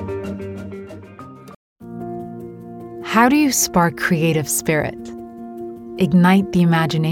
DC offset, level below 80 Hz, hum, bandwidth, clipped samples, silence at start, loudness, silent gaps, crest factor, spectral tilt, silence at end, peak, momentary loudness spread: under 0.1%; -50 dBFS; none; 17.5 kHz; under 0.1%; 0 s; -17 LUFS; 1.56-1.76 s; 18 dB; -5 dB/octave; 0 s; -2 dBFS; 21 LU